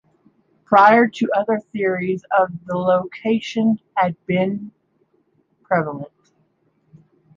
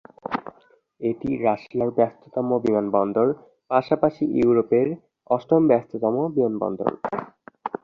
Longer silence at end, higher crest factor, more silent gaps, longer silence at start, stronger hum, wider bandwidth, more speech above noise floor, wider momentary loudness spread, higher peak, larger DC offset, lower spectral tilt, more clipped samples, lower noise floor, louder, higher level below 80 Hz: first, 1.3 s vs 0.1 s; about the same, 20 dB vs 20 dB; neither; first, 0.7 s vs 0.3 s; neither; first, 7.4 kHz vs 6.6 kHz; first, 46 dB vs 36 dB; about the same, 12 LU vs 12 LU; first, 0 dBFS vs -4 dBFS; neither; second, -7 dB/octave vs -9.5 dB/octave; neither; first, -64 dBFS vs -57 dBFS; first, -19 LUFS vs -23 LUFS; about the same, -64 dBFS vs -60 dBFS